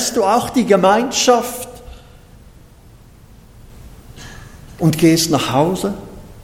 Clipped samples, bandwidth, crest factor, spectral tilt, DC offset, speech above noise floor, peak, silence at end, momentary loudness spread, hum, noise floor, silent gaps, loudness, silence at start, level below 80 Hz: under 0.1%; 17 kHz; 18 dB; -4.5 dB/octave; under 0.1%; 29 dB; 0 dBFS; 0 s; 23 LU; none; -43 dBFS; none; -15 LUFS; 0 s; -42 dBFS